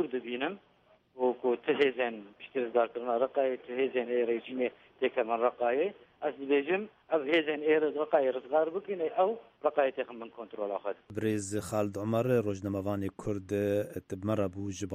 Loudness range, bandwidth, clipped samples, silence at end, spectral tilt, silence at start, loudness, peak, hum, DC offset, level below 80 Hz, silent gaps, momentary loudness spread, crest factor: 3 LU; 15 kHz; under 0.1%; 0 s; -6 dB/octave; 0 s; -32 LUFS; -12 dBFS; none; under 0.1%; -68 dBFS; none; 9 LU; 18 dB